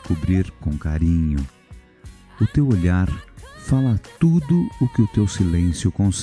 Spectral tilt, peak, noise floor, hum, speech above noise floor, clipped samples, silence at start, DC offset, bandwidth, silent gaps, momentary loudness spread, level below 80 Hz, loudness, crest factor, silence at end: -7 dB/octave; -4 dBFS; -43 dBFS; none; 25 dB; under 0.1%; 0.05 s; under 0.1%; 11 kHz; none; 8 LU; -32 dBFS; -20 LUFS; 14 dB; 0 s